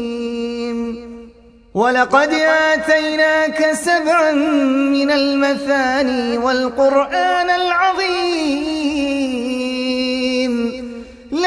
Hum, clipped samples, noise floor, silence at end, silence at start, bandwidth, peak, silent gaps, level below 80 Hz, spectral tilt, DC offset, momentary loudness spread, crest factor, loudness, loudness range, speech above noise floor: none; under 0.1%; -44 dBFS; 0 s; 0 s; 11 kHz; 0 dBFS; none; -50 dBFS; -3.5 dB/octave; under 0.1%; 9 LU; 16 dB; -16 LUFS; 3 LU; 29 dB